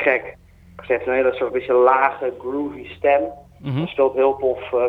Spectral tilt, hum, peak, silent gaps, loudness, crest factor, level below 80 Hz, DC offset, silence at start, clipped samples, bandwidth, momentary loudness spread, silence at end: -8.5 dB/octave; none; -2 dBFS; none; -20 LUFS; 18 dB; -52 dBFS; under 0.1%; 0 s; under 0.1%; 4.4 kHz; 12 LU; 0 s